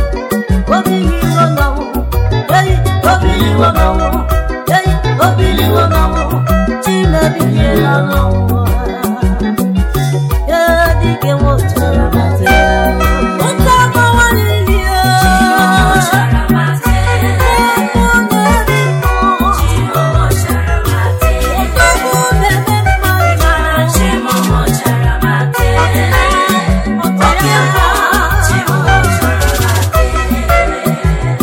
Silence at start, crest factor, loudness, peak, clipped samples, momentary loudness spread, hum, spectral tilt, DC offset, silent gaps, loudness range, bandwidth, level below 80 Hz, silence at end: 0 s; 10 dB; -11 LUFS; 0 dBFS; under 0.1%; 5 LU; none; -5.5 dB/octave; under 0.1%; none; 2 LU; 17 kHz; -16 dBFS; 0 s